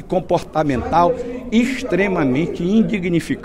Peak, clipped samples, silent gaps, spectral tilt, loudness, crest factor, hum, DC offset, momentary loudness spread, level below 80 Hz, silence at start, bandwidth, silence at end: -2 dBFS; under 0.1%; none; -7 dB/octave; -18 LUFS; 14 dB; none; under 0.1%; 4 LU; -38 dBFS; 0 s; 12.5 kHz; 0 s